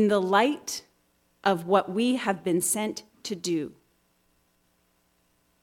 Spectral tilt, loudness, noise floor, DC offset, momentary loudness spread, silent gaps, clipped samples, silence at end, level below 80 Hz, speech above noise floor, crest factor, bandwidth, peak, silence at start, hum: -4 dB/octave; -26 LUFS; -69 dBFS; under 0.1%; 13 LU; none; under 0.1%; 1.9 s; -72 dBFS; 43 dB; 20 dB; 18 kHz; -8 dBFS; 0 s; none